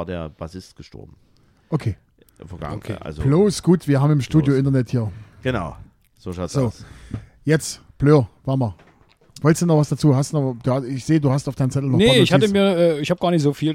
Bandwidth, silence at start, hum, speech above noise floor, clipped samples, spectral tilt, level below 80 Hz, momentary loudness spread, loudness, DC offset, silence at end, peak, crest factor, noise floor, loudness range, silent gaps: 15 kHz; 0 s; none; 30 dB; under 0.1%; -6.5 dB/octave; -44 dBFS; 17 LU; -19 LUFS; under 0.1%; 0 s; 0 dBFS; 20 dB; -49 dBFS; 7 LU; none